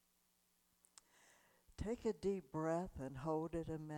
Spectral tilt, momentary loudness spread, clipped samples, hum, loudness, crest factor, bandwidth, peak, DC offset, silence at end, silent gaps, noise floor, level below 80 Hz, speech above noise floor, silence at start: -7.5 dB/octave; 7 LU; under 0.1%; none; -44 LUFS; 16 dB; 18.5 kHz; -28 dBFS; under 0.1%; 0 s; none; -79 dBFS; -62 dBFS; 36 dB; 1.8 s